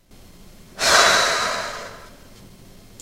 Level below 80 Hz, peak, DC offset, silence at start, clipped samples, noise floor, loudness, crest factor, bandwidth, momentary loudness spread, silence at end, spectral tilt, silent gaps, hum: -48 dBFS; 0 dBFS; under 0.1%; 0.75 s; under 0.1%; -45 dBFS; -17 LUFS; 22 dB; 16 kHz; 20 LU; 0.9 s; 0 dB/octave; none; none